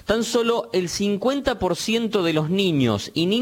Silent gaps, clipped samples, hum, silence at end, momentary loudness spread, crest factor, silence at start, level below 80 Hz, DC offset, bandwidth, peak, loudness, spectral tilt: none; under 0.1%; none; 0 s; 3 LU; 16 dB; 0.05 s; -48 dBFS; under 0.1%; 17 kHz; -6 dBFS; -22 LUFS; -5 dB/octave